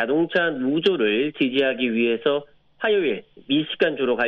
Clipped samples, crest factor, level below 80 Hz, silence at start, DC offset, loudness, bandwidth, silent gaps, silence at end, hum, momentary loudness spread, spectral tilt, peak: under 0.1%; 16 dB; -66 dBFS; 0 s; under 0.1%; -22 LUFS; 6 kHz; none; 0 s; none; 5 LU; -7 dB/octave; -6 dBFS